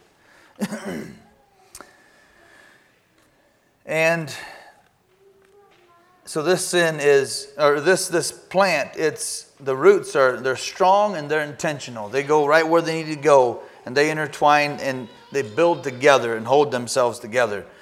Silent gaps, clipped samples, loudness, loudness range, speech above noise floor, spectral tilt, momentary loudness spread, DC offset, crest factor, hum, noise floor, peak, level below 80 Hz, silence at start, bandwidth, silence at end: none; under 0.1%; -20 LUFS; 9 LU; 41 dB; -4 dB/octave; 13 LU; under 0.1%; 22 dB; none; -61 dBFS; 0 dBFS; -68 dBFS; 0.6 s; 15.5 kHz; 0.15 s